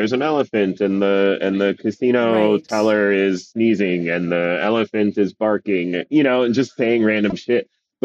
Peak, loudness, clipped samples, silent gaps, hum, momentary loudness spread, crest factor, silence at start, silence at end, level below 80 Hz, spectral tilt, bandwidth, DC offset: -4 dBFS; -18 LUFS; under 0.1%; none; none; 4 LU; 14 dB; 0 s; 0.4 s; -62 dBFS; -6.5 dB/octave; 8.4 kHz; under 0.1%